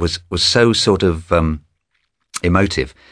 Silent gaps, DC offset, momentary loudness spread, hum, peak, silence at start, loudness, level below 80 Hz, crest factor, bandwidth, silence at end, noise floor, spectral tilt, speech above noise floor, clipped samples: none; under 0.1%; 10 LU; none; 0 dBFS; 0 s; -16 LUFS; -32 dBFS; 16 dB; 11 kHz; 0.25 s; -69 dBFS; -4.5 dB/octave; 53 dB; under 0.1%